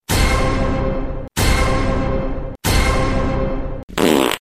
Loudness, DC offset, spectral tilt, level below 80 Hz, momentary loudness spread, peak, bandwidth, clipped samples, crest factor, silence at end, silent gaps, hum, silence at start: -19 LUFS; under 0.1%; -5 dB/octave; -22 dBFS; 9 LU; -2 dBFS; 15.5 kHz; under 0.1%; 14 dB; 0 s; 3.83-3.88 s; none; 0.1 s